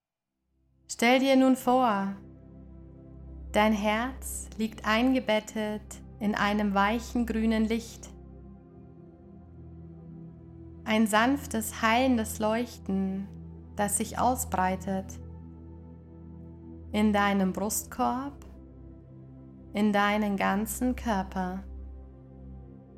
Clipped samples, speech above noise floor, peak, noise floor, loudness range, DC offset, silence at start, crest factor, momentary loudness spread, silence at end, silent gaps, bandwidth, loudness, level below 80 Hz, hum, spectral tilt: under 0.1%; 56 dB; -8 dBFS; -83 dBFS; 4 LU; under 0.1%; 0.9 s; 20 dB; 24 LU; 0.05 s; none; 16 kHz; -28 LUFS; -48 dBFS; none; -4.5 dB/octave